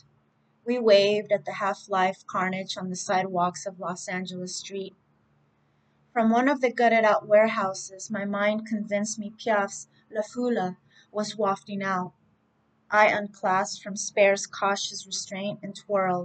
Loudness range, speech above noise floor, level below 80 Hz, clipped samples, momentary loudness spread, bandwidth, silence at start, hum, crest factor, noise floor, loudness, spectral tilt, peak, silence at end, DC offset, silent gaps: 6 LU; 42 dB; -78 dBFS; under 0.1%; 13 LU; 9.2 kHz; 0.65 s; none; 20 dB; -68 dBFS; -26 LUFS; -4 dB/octave; -6 dBFS; 0 s; under 0.1%; none